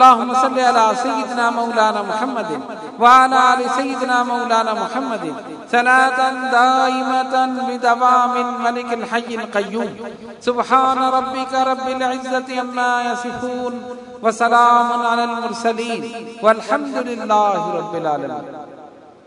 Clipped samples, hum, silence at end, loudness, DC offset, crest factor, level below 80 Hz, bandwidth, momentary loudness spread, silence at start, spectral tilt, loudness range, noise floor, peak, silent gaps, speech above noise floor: under 0.1%; none; 0.4 s; -17 LUFS; under 0.1%; 18 dB; -64 dBFS; 12 kHz; 12 LU; 0 s; -3.5 dB/octave; 4 LU; -41 dBFS; 0 dBFS; none; 24 dB